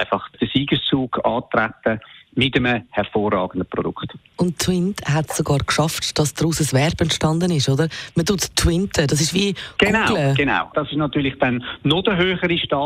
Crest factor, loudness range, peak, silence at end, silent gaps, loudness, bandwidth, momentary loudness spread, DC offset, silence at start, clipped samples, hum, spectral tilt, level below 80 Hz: 16 dB; 3 LU; -2 dBFS; 0 s; none; -20 LUFS; 16 kHz; 6 LU; under 0.1%; 0 s; under 0.1%; none; -4.5 dB/octave; -40 dBFS